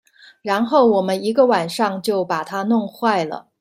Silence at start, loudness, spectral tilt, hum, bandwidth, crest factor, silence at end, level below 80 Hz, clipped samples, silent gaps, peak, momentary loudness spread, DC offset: 0.45 s; -19 LUFS; -5.5 dB/octave; none; 16 kHz; 16 dB; 0.2 s; -66 dBFS; under 0.1%; none; -2 dBFS; 8 LU; under 0.1%